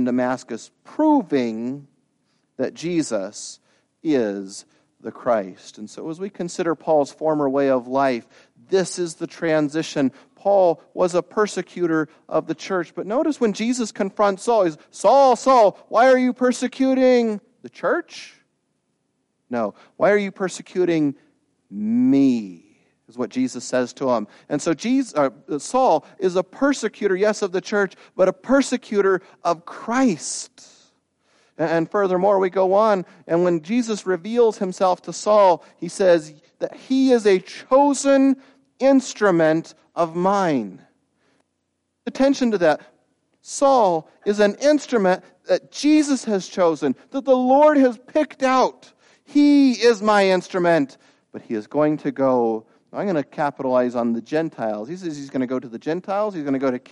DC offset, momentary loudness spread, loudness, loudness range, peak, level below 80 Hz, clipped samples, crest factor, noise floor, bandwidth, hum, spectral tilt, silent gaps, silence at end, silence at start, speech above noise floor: under 0.1%; 13 LU; -20 LUFS; 7 LU; -4 dBFS; -66 dBFS; under 0.1%; 16 dB; -74 dBFS; 11.5 kHz; none; -5 dB/octave; none; 0.15 s; 0 s; 54 dB